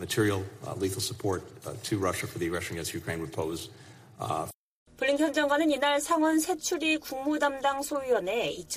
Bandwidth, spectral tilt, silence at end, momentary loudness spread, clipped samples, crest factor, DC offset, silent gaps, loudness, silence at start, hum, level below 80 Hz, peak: 15.5 kHz; -4 dB/octave; 0 s; 10 LU; under 0.1%; 16 dB; under 0.1%; 4.55-4.86 s; -29 LUFS; 0 s; none; -60 dBFS; -14 dBFS